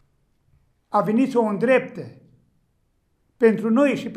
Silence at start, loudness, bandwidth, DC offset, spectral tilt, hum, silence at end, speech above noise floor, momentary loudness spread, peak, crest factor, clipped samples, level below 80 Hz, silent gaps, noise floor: 0.9 s; -20 LUFS; 11.5 kHz; under 0.1%; -7 dB/octave; none; 0 s; 48 dB; 15 LU; -4 dBFS; 18 dB; under 0.1%; -68 dBFS; none; -67 dBFS